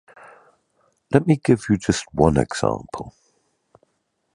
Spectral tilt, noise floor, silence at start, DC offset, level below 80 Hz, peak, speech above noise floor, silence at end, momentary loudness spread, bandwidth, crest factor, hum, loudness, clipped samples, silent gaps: -6.5 dB/octave; -72 dBFS; 1.1 s; under 0.1%; -42 dBFS; 0 dBFS; 52 dB; 1.25 s; 16 LU; 11 kHz; 22 dB; none; -20 LUFS; under 0.1%; none